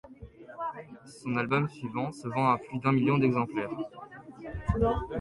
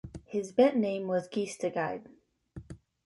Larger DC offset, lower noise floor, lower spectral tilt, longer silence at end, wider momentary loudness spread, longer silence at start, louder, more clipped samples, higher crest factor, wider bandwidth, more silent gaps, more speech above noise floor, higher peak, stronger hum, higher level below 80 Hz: neither; about the same, -48 dBFS vs -50 dBFS; first, -8 dB/octave vs -6 dB/octave; second, 0 s vs 0.3 s; second, 21 LU vs 24 LU; about the same, 0.05 s vs 0.05 s; about the same, -30 LUFS vs -30 LUFS; neither; about the same, 18 dB vs 20 dB; about the same, 11.5 kHz vs 11.5 kHz; neither; about the same, 20 dB vs 21 dB; about the same, -12 dBFS vs -12 dBFS; neither; first, -46 dBFS vs -60 dBFS